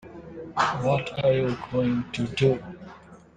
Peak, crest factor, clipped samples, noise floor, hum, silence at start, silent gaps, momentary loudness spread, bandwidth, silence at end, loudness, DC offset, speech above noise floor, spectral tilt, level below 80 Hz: -8 dBFS; 18 dB; under 0.1%; -47 dBFS; none; 0.05 s; none; 19 LU; 9.4 kHz; 0.2 s; -25 LUFS; under 0.1%; 23 dB; -6.5 dB/octave; -52 dBFS